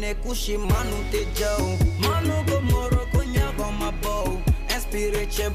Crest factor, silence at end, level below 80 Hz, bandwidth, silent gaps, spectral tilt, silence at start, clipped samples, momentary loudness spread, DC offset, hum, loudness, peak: 12 dB; 0 s; -26 dBFS; 16 kHz; none; -5 dB/octave; 0 s; under 0.1%; 5 LU; under 0.1%; none; -25 LUFS; -12 dBFS